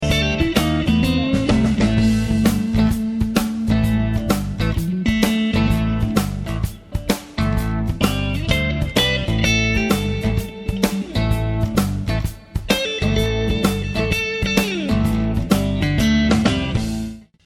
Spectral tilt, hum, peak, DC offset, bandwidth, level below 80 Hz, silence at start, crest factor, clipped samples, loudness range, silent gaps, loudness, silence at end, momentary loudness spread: -5.5 dB/octave; none; -2 dBFS; under 0.1%; 17 kHz; -28 dBFS; 0 s; 18 dB; under 0.1%; 3 LU; none; -19 LUFS; 0.25 s; 6 LU